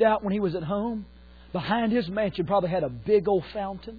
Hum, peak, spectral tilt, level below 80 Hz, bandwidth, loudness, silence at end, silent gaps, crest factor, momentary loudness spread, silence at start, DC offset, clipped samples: none; -10 dBFS; -9.5 dB/octave; -50 dBFS; 4.9 kHz; -27 LUFS; 0 s; none; 16 dB; 10 LU; 0 s; under 0.1%; under 0.1%